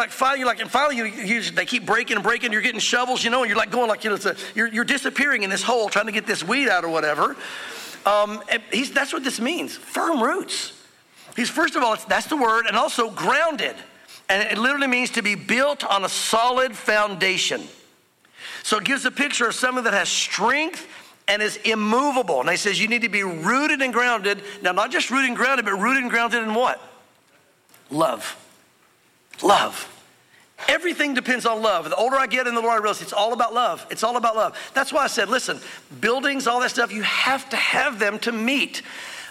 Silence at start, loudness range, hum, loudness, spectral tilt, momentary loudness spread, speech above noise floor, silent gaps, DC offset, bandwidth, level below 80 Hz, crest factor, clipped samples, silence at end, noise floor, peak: 0 s; 3 LU; none; -21 LUFS; -2.5 dB/octave; 7 LU; 37 dB; none; under 0.1%; 16.5 kHz; -66 dBFS; 18 dB; under 0.1%; 0 s; -59 dBFS; -4 dBFS